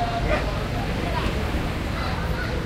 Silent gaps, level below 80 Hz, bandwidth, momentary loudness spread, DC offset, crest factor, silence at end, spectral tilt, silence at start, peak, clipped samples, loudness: none; -30 dBFS; 16 kHz; 3 LU; under 0.1%; 16 dB; 0 s; -6 dB/octave; 0 s; -8 dBFS; under 0.1%; -26 LUFS